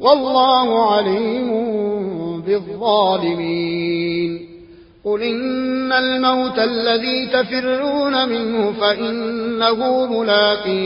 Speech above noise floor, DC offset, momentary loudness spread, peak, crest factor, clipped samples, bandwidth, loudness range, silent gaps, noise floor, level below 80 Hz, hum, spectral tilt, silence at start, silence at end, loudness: 25 dB; under 0.1%; 7 LU; 0 dBFS; 16 dB; under 0.1%; 5.6 kHz; 3 LU; none; -42 dBFS; -56 dBFS; none; -9 dB/octave; 0 s; 0 s; -18 LUFS